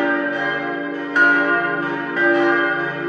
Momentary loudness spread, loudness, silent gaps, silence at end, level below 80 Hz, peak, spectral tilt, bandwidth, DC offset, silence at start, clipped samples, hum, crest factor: 8 LU; -18 LUFS; none; 0 s; -72 dBFS; -4 dBFS; -6 dB/octave; 7.8 kHz; under 0.1%; 0 s; under 0.1%; none; 16 dB